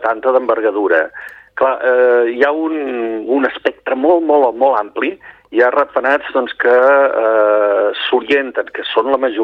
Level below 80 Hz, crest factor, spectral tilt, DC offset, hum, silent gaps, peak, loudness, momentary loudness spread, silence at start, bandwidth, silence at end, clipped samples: -60 dBFS; 14 dB; -5 dB/octave; under 0.1%; none; none; 0 dBFS; -14 LUFS; 9 LU; 0 s; 5.6 kHz; 0 s; under 0.1%